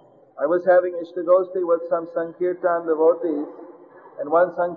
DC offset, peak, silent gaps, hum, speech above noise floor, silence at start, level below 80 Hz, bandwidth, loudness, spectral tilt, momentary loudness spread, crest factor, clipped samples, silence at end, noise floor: under 0.1%; -6 dBFS; none; none; 25 dB; 0.35 s; -74 dBFS; 4.2 kHz; -21 LUFS; -9.5 dB/octave; 10 LU; 16 dB; under 0.1%; 0 s; -45 dBFS